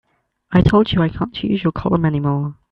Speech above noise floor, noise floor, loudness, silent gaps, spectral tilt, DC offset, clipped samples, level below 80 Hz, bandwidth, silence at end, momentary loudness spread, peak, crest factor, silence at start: 28 dB; -45 dBFS; -18 LUFS; none; -9 dB/octave; under 0.1%; under 0.1%; -36 dBFS; 7 kHz; 0.2 s; 7 LU; 0 dBFS; 16 dB; 0.5 s